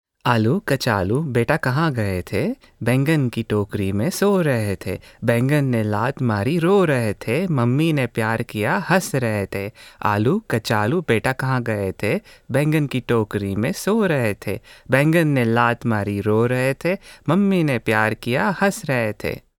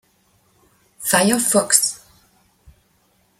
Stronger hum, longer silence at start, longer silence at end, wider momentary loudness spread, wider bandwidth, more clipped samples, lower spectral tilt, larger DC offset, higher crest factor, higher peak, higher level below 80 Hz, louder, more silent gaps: neither; second, 0.25 s vs 1 s; second, 0.2 s vs 1.45 s; second, 7 LU vs 12 LU; first, 18.5 kHz vs 16.5 kHz; neither; first, -6.5 dB/octave vs -2 dB/octave; neither; about the same, 18 dB vs 22 dB; about the same, -2 dBFS vs 0 dBFS; first, -50 dBFS vs -60 dBFS; second, -20 LUFS vs -16 LUFS; neither